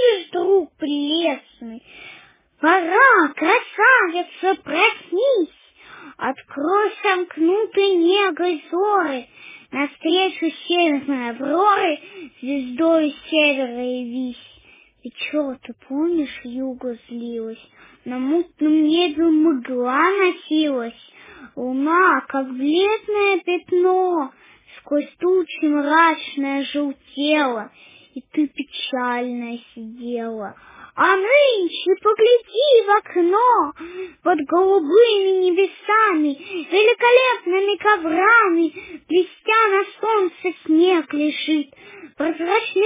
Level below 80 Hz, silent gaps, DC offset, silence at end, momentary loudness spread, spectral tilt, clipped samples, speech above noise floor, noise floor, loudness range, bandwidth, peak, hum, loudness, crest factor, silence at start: -66 dBFS; none; under 0.1%; 0 s; 15 LU; -7 dB/octave; under 0.1%; 32 dB; -51 dBFS; 7 LU; 3.9 kHz; -2 dBFS; none; -18 LUFS; 18 dB; 0 s